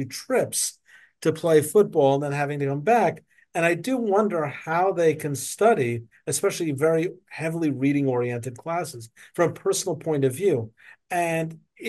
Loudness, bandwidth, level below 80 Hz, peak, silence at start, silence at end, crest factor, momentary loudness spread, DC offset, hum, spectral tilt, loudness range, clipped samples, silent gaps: -24 LUFS; 12.5 kHz; -72 dBFS; -6 dBFS; 0 s; 0 s; 18 dB; 10 LU; under 0.1%; none; -5 dB/octave; 4 LU; under 0.1%; none